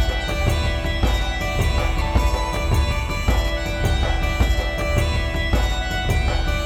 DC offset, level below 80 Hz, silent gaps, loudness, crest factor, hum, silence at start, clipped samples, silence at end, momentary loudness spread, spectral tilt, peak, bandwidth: under 0.1%; -22 dBFS; none; -22 LUFS; 14 dB; none; 0 s; under 0.1%; 0 s; 2 LU; -5 dB/octave; -6 dBFS; 16.5 kHz